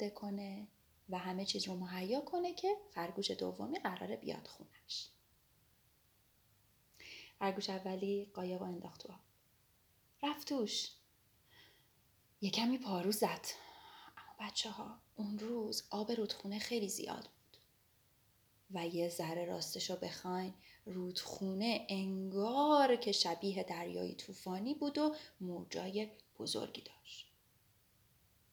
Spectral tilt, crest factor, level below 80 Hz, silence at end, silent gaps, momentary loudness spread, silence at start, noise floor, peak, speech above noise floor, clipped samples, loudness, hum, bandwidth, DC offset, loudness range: -4 dB/octave; 22 dB; -78 dBFS; 1.3 s; none; 16 LU; 0 s; -73 dBFS; -18 dBFS; 33 dB; under 0.1%; -40 LUFS; none; over 20 kHz; under 0.1%; 9 LU